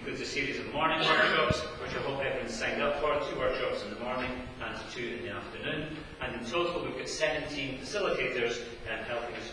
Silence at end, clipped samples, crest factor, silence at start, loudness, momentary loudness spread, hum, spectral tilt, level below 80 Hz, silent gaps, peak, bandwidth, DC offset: 0 s; under 0.1%; 20 dB; 0 s; -32 LUFS; 11 LU; none; -4 dB/octave; -52 dBFS; none; -12 dBFS; 11 kHz; under 0.1%